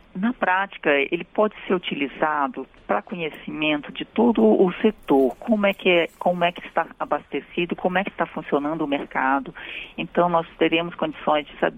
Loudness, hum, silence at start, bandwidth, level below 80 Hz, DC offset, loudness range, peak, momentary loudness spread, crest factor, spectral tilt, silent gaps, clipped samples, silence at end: -23 LUFS; none; 0.15 s; 15.5 kHz; -56 dBFS; under 0.1%; 4 LU; -6 dBFS; 9 LU; 16 dB; -7.5 dB/octave; none; under 0.1%; 0 s